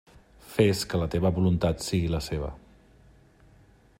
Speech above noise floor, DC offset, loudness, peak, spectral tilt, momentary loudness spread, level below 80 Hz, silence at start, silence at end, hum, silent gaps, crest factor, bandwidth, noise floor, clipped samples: 32 dB; under 0.1%; -27 LUFS; -8 dBFS; -6 dB/octave; 10 LU; -44 dBFS; 0.45 s; 1.4 s; none; none; 20 dB; 16 kHz; -57 dBFS; under 0.1%